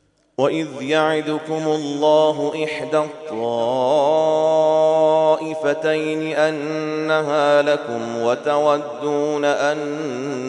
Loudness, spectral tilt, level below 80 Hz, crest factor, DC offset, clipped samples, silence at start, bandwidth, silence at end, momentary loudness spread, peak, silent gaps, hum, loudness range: -19 LUFS; -5 dB/octave; -70 dBFS; 16 dB; under 0.1%; under 0.1%; 0.4 s; 10.5 kHz; 0 s; 8 LU; -2 dBFS; none; none; 2 LU